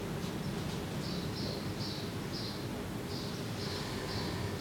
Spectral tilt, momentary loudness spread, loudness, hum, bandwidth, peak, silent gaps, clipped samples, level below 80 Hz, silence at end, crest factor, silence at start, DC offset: -5 dB/octave; 2 LU; -38 LUFS; none; 18 kHz; -26 dBFS; none; under 0.1%; -54 dBFS; 0 s; 12 dB; 0 s; under 0.1%